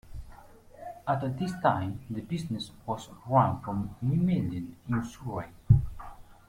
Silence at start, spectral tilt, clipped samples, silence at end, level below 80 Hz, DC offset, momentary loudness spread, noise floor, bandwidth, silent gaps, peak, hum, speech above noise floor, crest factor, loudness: 0.05 s; -8 dB/octave; under 0.1%; 0.15 s; -46 dBFS; under 0.1%; 18 LU; -51 dBFS; 15 kHz; none; -8 dBFS; none; 21 dB; 22 dB; -30 LUFS